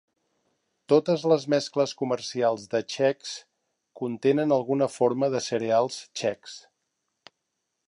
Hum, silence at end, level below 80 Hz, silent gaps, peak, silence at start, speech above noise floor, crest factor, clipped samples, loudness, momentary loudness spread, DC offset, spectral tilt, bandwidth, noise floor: none; 1.3 s; -76 dBFS; none; -8 dBFS; 0.9 s; 55 dB; 20 dB; under 0.1%; -26 LUFS; 12 LU; under 0.1%; -5 dB/octave; 11 kHz; -80 dBFS